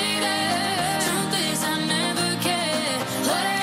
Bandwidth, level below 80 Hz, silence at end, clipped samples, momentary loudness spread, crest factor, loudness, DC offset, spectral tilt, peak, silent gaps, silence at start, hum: 16 kHz; -58 dBFS; 0 s; under 0.1%; 2 LU; 14 dB; -23 LUFS; under 0.1%; -2.5 dB/octave; -10 dBFS; none; 0 s; none